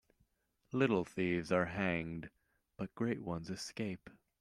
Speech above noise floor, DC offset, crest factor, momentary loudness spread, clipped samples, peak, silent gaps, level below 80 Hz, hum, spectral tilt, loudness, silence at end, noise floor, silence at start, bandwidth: 41 dB; under 0.1%; 22 dB; 13 LU; under 0.1%; -18 dBFS; none; -66 dBFS; none; -6 dB/octave; -38 LUFS; 0.3 s; -78 dBFS; 0.7 s; 13 kHz